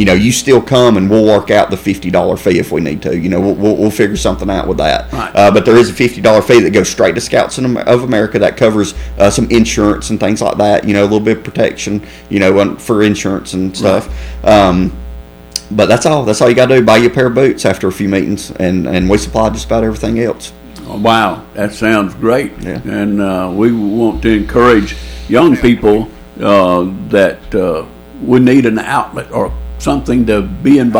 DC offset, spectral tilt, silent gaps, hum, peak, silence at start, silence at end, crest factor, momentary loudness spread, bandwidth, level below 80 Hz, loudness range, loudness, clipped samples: under 0.1%; -5.5 dB/octave; none; none; 0 dBFS; 0 s; 0 s; 10 dB; 10 LU; over 20 kHz; -30 dBFS; 4 LU; -11 LUFS; 0.2%